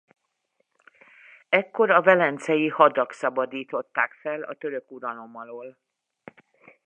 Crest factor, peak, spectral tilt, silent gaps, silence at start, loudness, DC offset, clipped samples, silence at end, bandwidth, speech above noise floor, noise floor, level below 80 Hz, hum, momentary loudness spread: 22 dB; -2 dBFS; -5.5 dB/octave; none; 1.5 s; -23 LUFS; under 0.1%; under 0.1%; 1.15 s; 9.6 kHz; 50 dB; -74 dBFS; -86 dBFS; none; 20 LU